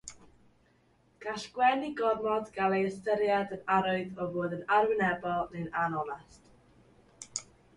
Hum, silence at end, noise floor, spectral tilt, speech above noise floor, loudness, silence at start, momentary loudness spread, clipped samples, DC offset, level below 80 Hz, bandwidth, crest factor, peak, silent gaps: none; 0.35 s; -67 dBFS; -5 dB/octave; 37 dB; -31 LUFS; 0.05 s; 13 LU; under 0.1%; under 0.1%; -66 dBFS; 11.5 kHz; 18 dB; -14 dBFS; none